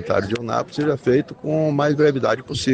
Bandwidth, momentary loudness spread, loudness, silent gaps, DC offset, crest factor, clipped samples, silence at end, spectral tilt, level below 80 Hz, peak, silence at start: 9.4 kHz; 6 LU; -20 LUFS; none; under 0.1%; 14 dB; under 0.1%; 0 s; -6 dB/octave; -52 dBFS; -6 dBFS; 0 s